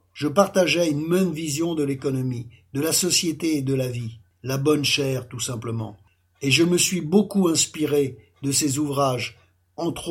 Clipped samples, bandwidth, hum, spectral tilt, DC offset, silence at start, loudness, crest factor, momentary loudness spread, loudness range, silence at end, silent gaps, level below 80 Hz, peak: under 0.1%; 17 kHz; none; -4 dB/octave; under 0.1%; 0.15 s; -22 LUFS; 20 dB; 12 LU; 3 LU; 0 s; none; -60 dBFS; -4 dBFS